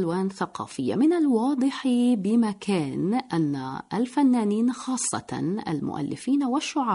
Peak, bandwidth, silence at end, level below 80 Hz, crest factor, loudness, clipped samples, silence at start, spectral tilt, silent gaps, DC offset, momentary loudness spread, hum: -12 dBFS; 11 kHz; 0 s; -66 dBFS; 12 dB; -25 LUFS; under 0.1%; 0 s; -5.5 dB/octave; none; under 0.1%; 8 LU; none